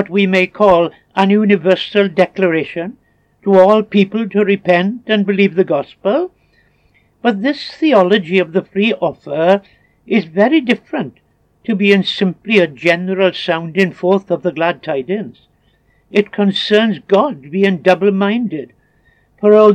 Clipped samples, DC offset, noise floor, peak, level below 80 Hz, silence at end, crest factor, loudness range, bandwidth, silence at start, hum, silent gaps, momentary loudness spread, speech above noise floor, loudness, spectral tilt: under 0.1%; under 0.1%; -56 dBFS; 0 dBFS; -56 dBFS; 0 s; 14 dB; 3 LU; 8.6 kHz; 0 s; none; none; 8 LU; 43 dB; -14 LUFS; -7 dB/octave